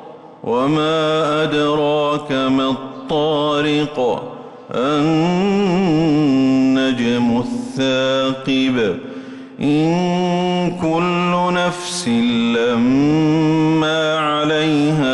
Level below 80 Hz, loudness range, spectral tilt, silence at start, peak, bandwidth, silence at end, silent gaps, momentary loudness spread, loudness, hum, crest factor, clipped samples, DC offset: -50 dBFS; 2 LU; -6 dB/octave; 0 s; -8 dBFS; 11.5 kHz; 0 s; none; 7 LU; -17 LUFS; none; 8 dB; under 0.1%; under 0.1%